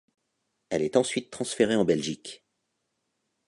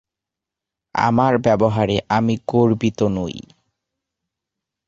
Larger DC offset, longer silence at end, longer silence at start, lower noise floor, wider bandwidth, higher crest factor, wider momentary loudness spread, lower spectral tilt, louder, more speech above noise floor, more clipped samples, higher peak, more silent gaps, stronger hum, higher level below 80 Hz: neither; second, 1.1 s vs 1.45 s; second, 0.7 s vs 0.95 s; second, -79 dBFS vs -86 dBFS; first, 11.5 kHz vs 7.6 kHz; about the same, 22 dB vs 18 dB; about the same, 11 LU vs 10 LU; second, -4.5 dB/octave vs -7 dB/octave; second, -27 LUFS vs -18 LUFS; second, 52 dB vs 68 dB; neither; second, -8 dBFS vs -2 dBFS; neither; neither; second, -64 dBFS vs -48 dBFS